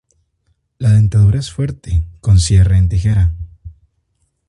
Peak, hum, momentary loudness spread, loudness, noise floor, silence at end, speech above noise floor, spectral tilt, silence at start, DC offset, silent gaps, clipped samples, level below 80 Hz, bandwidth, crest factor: -2 dBFS; none; 11 LU; -14 LUFS; -65 dBFS; 0.8 s; 53 dB; -6.5 dB/octave; 0.8 s; under 0.1%; none; under 0.1%; -22 dBFS; 11 kHz; 14 dB